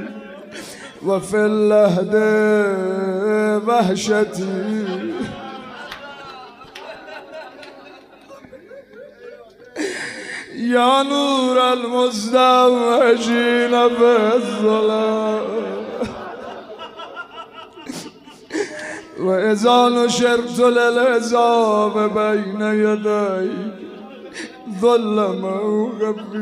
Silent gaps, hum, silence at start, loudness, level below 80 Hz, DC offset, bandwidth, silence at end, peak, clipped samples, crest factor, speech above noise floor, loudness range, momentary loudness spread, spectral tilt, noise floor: none; none; 0 s; -17 LUFS; -60 dBFS; under 0.1%; 15 kHz; 0 s; -2 dBFS; under 0.1%; 16 dB; 26 dB; 17 LU; 20 LU; -4.5 dB/octave; -43 dBFS